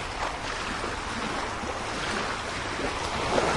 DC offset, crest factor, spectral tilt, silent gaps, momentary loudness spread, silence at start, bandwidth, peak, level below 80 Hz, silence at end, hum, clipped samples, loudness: under 0.1%; 20 dB; -3.5 dB/octave; none; 3 LU; 0 s; 11.5 kHz; -10 dBFS; -44 dBFS; 0 s; none; under 0.1%; -30 LUFS